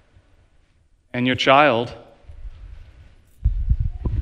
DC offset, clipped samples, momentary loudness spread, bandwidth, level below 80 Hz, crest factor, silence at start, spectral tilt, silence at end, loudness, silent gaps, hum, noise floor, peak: under 0.1%; under 0.1%; 18 LU; 9 kHz; -30 dBFS; 22 dB; 1.15 s; -6 dB/octave; 0 s; -20 LUFS; none; none; -58 dBFS; 0 dBFS